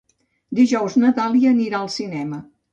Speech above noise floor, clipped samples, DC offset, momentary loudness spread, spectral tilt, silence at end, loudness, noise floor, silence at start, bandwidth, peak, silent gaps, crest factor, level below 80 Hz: 21 dB; under 0.1%; under 0.1%; 12 LU; -5.5 dB/octave; 0.3 s; -19 LUFS; -38 dBFS; 0.5 s; 7.8 kHz; -6 dBFS; none; 14 dB; -64 dBFS